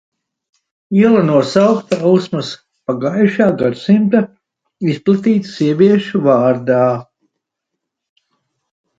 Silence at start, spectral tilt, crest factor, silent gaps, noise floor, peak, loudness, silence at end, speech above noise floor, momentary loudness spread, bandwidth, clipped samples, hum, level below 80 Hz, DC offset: 0.9 s; -7.5 dB/octave; 14 dB; none; -78 dBFS; 0 dBFS; -14 LUFS; 1.95 s; 65 dB; 10 LU; 7.8 kHz; under 0.1%; none; -58 dBFS; under 0.1%